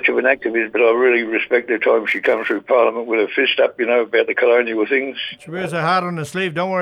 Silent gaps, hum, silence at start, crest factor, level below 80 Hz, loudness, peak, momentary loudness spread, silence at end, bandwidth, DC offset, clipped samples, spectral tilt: none; none; 0 s; 16 dB; -64 dBFS; -17 LUFS; -2 dBFS; 7 LU; 0 s; 12 kHz; under 0.1%; under 0.1%; -5.5 dB/octave